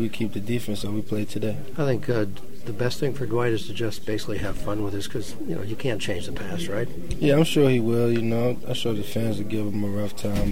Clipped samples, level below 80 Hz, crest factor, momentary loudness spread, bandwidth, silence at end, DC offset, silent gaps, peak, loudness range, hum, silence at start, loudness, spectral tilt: under 0.1%; -42 dBFS; 18 dB; 11 LU; 16.5 kHz; 0 s; 5%; none; -6 dBFS; 6 LU; none; 0 s; -26 LUFS; -6 dB/octave